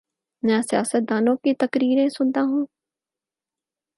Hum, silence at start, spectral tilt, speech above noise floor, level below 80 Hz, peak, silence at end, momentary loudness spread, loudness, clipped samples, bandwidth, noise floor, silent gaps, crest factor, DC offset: none; 0.45 s; -5 dB/octave; 69 dB; -72 dBFS; -6 dBFS; 1.3 s; 5 LU; -22 LUFS; under 0.1%; 11.5 kHz; -90 dBFS; none; 16 dB; under 0.1%